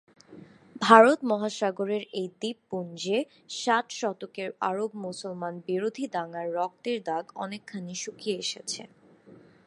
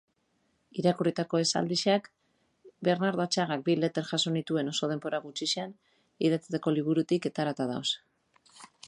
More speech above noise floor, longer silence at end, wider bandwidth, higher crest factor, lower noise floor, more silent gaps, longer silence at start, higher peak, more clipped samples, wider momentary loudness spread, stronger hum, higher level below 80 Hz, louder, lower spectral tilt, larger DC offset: second, 26 dB vs 45 dB; first, 0.3 s vs 0 s; about the same, 11.5 kHz vs 11 kHz; first, 28 dB vs 18 dB; second, -54 dBFS vs -74 dBFS; neither; second, 0.3 s vs 0.75 s; first, 0 dBFS vs -12 dBFS; neither; first, 15 LU vs 5 LU; neither; about the same, -78 dBFS vs -76 dBFS; about the same, -28 LUFS vs -29 LUFS; about the same, -4 dB/octave vs -4.5 dB/octave; neither